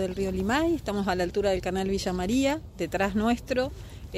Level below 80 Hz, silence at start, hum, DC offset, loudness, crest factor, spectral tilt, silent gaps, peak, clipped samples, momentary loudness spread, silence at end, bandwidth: -42 dBFS; 0 s; none; under 0.1%; -27 LUFS; 16 dB; -5.5 dB/octave; none; -12 dBFS; under 0.1%; 5 LU; 0 s; 15.5 kHz